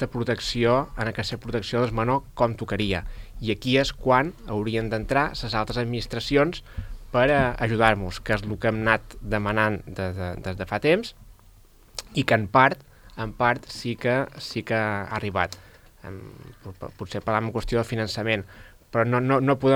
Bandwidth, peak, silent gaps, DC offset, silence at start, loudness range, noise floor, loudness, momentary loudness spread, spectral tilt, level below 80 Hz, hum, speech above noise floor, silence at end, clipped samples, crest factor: 16.5 kHz; 0 dBFS; none; under 0.1%; 0 s; 6 LU; -52 dBFS; -25 LUFS; 17 LU; -6 dB/octave; -42 dBFS; none; 28 dB; 0 s; under 0.1%; 24 dB